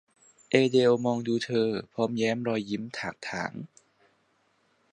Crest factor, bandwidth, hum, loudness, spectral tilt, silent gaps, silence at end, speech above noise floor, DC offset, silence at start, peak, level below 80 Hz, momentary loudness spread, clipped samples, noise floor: 24 dB; 10.5 kHz; none; -28 LUFS; -5.5 dB/octave; none; 1.25 s; 42 dB; under 0.1%; 0.5 s; -6 dBFS; -70 dBFS; 13 LU; under 0.1%; -69 dBFS